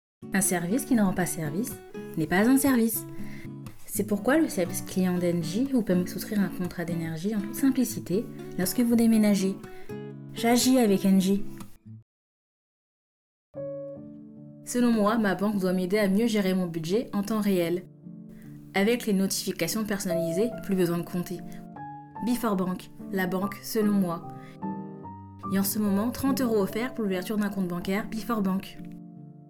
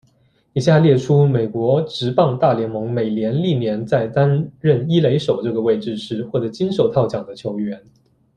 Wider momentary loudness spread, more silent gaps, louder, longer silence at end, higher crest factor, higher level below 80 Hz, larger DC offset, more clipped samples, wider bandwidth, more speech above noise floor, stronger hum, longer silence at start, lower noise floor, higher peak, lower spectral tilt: first, 19 LU vs 11 LU; first, 12.02-13.53 s vs none; second, -27 LUFS vs -18 LUFS; second, 0.05 s vs 0.6 s; about the same, 14 dB vs 16 dB; about the same, -54 dBFS vs -54 dBFS; neither; neither; first, 18 kHz vs 9.4 kHz; first, over 64 dB vs 41 dB; neither; second, 0.2 s vs 0.55 s; first, under -90 dBFS vs -58 dBFS; second, -12 dBFS vs -2 dBFS; second, -5.5 dB/octave vs -8 dB/octave